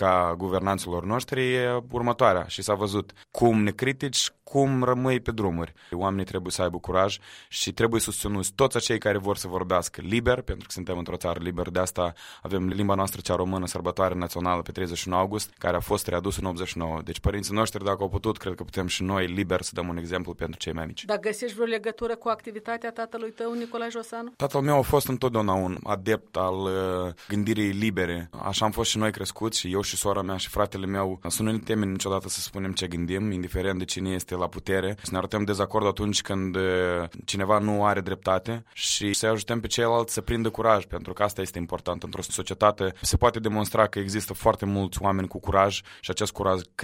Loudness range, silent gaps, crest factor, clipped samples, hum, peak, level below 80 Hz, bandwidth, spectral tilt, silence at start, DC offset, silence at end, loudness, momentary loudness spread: 4 LU; none; 22 dB; under 0.1%; none; -4 dBFS; -46 dBFS; 16 kHz; -4.5 dB/octave; 0 s; under 0.1%; 0 s; -27 LUFS; 9 LU